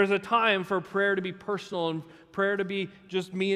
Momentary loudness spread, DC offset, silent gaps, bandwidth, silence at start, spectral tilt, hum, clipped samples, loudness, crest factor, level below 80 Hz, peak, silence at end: 10 LU; under 0.1%; none; 12 kHz; 0 s; -5.5 dB/octave; none; under 0.1%; -28 LUFS; 18 dB; -70 dBFS; -10 dBFS; 0 s